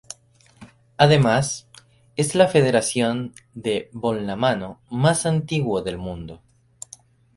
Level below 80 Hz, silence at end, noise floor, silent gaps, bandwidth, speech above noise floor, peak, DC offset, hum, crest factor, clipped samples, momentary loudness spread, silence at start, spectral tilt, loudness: -52 dBFS; 1 s; -54 dBFS; none; 11.5 kHz; 33 dB; 0 dBFS; under 0.1%; none; 22 dB; under 0.1%; 23 LU; 0.6 s; -5 dB/octave; -21 LUFS